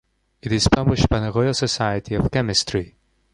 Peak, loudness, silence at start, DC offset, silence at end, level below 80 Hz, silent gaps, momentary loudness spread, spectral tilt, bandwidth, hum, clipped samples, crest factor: -2 dBFS; -20 LUFS; 0.45 s; under 0.1%; 0.45 s; -34 dBFS; none; 9 LU; -5 dB/octave; 11.5 kHz; none; under 0.1%; 20 dB